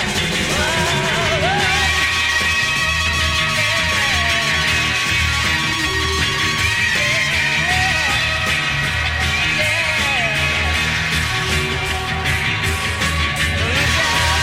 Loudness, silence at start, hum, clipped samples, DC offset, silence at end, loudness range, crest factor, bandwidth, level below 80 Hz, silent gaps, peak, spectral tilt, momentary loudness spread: -16 LUFS; 0 s; none; under 0.1%; under 0.1%; 0 s; 2 LU; 14 dB; 16.5 kHz; -30 dBFS; none; -4 dBFS; -2.5 dB/octave; 3 LU